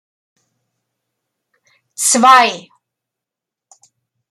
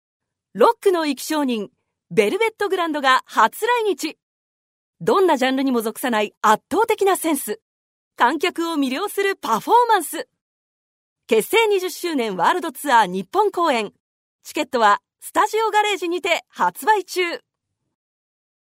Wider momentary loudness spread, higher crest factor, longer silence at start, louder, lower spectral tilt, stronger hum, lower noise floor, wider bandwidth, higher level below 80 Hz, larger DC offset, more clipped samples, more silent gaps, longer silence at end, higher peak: first, 24 LU vs 8 LU; about the same, 18 dB vs 20 dB; first, 2 s vs 0.55 s; first, -10 LUFS vs -20 LUFS; second, -0.5 dB/octave vs -3 dB/octave; neither; second, -84 dBFS vs under -90 dBFS; about the same, 16 kHz vs 16 kHz; about the same, -72 dBFS vs -72 dBFS; neither; neither; second, none vs 4.23-4.93 s, 6.37-6.41 s, 7.62-8.11 s, 10.41-11.16 s, 14.00-14.39 s; first, 1.7 s vs 1.25 s; about the same, 0 dBFS vs 0 dBFS